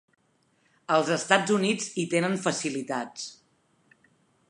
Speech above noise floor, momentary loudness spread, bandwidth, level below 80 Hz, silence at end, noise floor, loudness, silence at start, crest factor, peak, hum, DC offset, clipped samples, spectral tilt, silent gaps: 42 dB; 15 LU; 11.5 kHz; -80 dBFS; 1.15 s; -68 dBFS; -26 LUFS; 0.9 s; 24 dB; -4 dBFS; none; under 0.1%; under 0.1%; -4 dB/octave; none